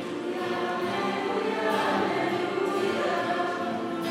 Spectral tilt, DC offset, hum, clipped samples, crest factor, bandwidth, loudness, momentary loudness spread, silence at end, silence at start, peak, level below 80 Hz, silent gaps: -5 dB/octave; under 0.1%; none; under 0.1%; 12 dB; 16 kHz; -28 LUFS; 5 LU; 0 s; 0 s; -14 dBFS; -76 dBFS; none